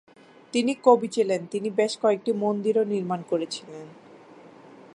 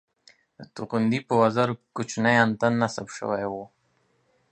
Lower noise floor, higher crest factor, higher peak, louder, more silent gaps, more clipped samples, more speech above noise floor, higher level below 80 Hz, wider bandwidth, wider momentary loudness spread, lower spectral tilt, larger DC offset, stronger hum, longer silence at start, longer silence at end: second, -49 dBFS vs -68 dBFS; about the same, 22 dB vs 22 dB; about the same, -4 dBFS vs -4 dBFS; about the same, -25 LUFS vs -24 LUFS; neither; neither; second, 25 dB vs 44 dB; second, -78 dBFS vs -64 dBFS; first, 11 kHz vs 9.4 kHz; about the same, 11 LU vs 13 LU; about the same, -5 dB/octave vs -5.5 dB/octave; neither; neither; about the same, 0.55 s vs 0.6 s; second, 0.5 s vs 0.85 s